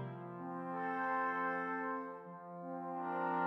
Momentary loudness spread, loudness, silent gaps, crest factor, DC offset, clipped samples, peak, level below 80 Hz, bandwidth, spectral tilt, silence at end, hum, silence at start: 11 LU; -40 LUFS; none; 16 dB; under 0.1%; under 0.1%; -24 dBFS; under -90 dBFS; 6 kHz; -8.5 dB/octave; 0 s; none; 0 s